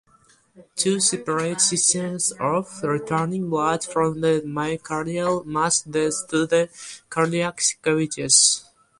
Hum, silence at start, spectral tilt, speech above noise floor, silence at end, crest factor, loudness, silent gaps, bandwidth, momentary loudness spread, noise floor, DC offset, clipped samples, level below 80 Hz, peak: none; 0.55 s; -3 dB/octave; 35 dB; 0.4 s; 20 dB; -21 LUFS; none; 11.5 kHz; 10 LU; -58 dBFS; under 0.1%; under 0.1%; -60 dBFS; -2 dBFS